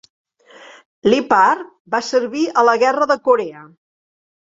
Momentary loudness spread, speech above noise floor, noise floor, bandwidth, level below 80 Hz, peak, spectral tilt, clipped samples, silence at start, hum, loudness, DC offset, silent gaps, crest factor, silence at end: 9 LU; 28 dB; -44 dBFS; 7.8 kHz; -62 dBFS; -2 dBFS; -4 dB/octave; under 0.1%; 1.05 s; none; -16 LUFS; under 0.1%; 1.80-1.85 s; 16 dB; 0.8 s